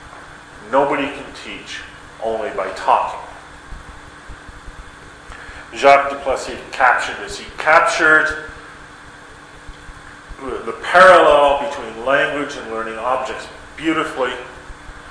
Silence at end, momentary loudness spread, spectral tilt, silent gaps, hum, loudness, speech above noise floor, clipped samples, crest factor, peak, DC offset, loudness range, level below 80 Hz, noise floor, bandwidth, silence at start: 0 s; 26 LU; -3.5 dB/octave; none; none; -16 LUFS; 23 dB; under 0.1%; 18 dB; 0 dBFS; under 0.1%; 9 LU; -44 dBFS; -39 dBFS; 11 kHz; 0 s